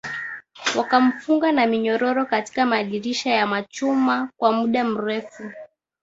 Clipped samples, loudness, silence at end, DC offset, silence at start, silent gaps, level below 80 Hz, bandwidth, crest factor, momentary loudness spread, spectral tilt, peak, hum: under 0.1%; -21 LUFS; 0.35 s; under 0.1%; 0.05 s; none; -66 dBFS; 7.8 kHz; 18 dB; 11 LU; -4 dB/octave; -2 dBFS; none